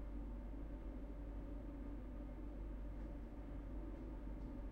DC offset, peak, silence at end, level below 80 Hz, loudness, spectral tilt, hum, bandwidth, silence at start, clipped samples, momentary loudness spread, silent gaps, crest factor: under 0.1%; -36 dBFS; 0 s; -50 dBFS; -52 LUFS; -9 dB/octave; none; 4.1 kHz; 0 s; under 0.1%; 1 LU; none; 12 dB